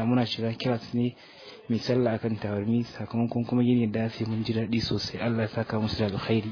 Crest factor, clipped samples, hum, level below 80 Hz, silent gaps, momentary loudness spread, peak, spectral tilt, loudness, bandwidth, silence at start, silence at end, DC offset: 16 dB; under 0.1%; none; -56 dBFS; none; 5 LU; -12 dBFS; -7.5 dB/octave; -28 LUFS; 5.4 kHz; 0 s; 0 s; under 0.1%